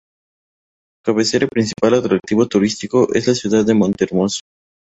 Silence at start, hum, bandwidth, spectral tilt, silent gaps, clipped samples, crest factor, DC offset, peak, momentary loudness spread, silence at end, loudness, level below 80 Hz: 1.05 s; none; 8.2 kHz; -5 dB/octave; none; under 0.1%; 16 dB; under 0.1%; -2 dBFS; 5 LU; 0.55 s; -17 LUFS; -52 dBFS